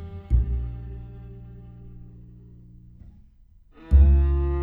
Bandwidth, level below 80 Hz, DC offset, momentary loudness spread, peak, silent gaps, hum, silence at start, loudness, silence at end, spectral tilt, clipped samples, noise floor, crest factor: 2.8 kHz; -24 dBFS; under 0.1%; 27 LU; -6 dBFS; none; none; 0 s; -22 LUFS; 0 s; -11.5 dB/octave; under 0.1%; -53 dBFS; 18 dB